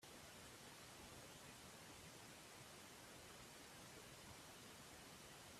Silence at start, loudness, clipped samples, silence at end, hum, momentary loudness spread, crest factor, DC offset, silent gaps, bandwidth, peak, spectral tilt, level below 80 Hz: 0 s; -59 LUFS; under 0.1%; 0 s; none; 1 LU; 16 dB; under 0.1%; none; 15.5 kHz; -46 dBFS; -2.5 dB/octave; -78 dBFS